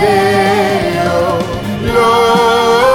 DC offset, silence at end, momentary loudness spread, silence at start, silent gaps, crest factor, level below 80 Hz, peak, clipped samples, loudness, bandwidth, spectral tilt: under 0.1%; 0 s; 7 LU; 0 s; none; 10 dB; -34 dBFS; -2 dBFS; under 0.1%; -11 LUFS; 19.5 kHz; -5 dB/octave